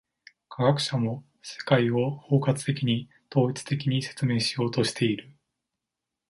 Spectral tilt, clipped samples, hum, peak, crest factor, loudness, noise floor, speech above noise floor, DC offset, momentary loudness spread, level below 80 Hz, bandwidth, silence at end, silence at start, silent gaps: -6 dB/octave; under 0.1%; none; -8 dBFS; 20 dB; -26 LUFS; -86 dBFS; 61 dB; under 0.1%; 8 LU; -64 dBFS; 11.5 kHz; 1 s; 0.5 s; none